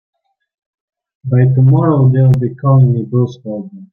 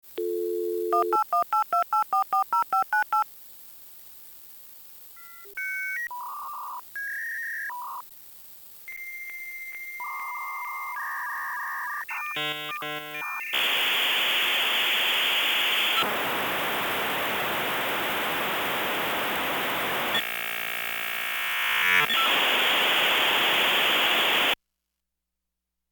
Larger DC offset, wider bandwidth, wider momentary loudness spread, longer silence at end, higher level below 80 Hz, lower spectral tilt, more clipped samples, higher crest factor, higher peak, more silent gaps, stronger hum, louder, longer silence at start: neither; second, 3.7 kHz vs over 20 kHz; second, 15 LU vs 20 LU; second, 0.1 s vs 1.35 s; first, -46 dBFS vs -68 dBFS; first, -11.5 dB/octave vs -1 dB/octave; neither; second, 10 dB vs 18 dB; first, -2 dBFS vs -10 dBFS; neither; neither; first, -12 LUFS vs -25 LUFS; first, 1.25 s vs 0.05 s